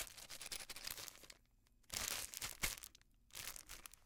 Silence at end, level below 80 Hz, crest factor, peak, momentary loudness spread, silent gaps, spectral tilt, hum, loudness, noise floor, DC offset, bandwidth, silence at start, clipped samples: 0 s; -62 dBFS; 30 dB; -20 dBFS; 15 LU; none; 0 dB/octave; none; -47 LUFS; -73 dBFS; under 0.1%; 18 kHz; 0 s; under 0.1%